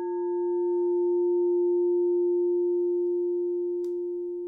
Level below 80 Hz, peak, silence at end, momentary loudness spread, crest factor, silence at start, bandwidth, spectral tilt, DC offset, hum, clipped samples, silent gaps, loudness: -74 dBFS; -20 dBFS; 0 s; 6 LU; 6 dB; 0 s; 1.8 kHz; -9 dB/octave; under 0.1%; none; under 0.1%; none; -26 LUFS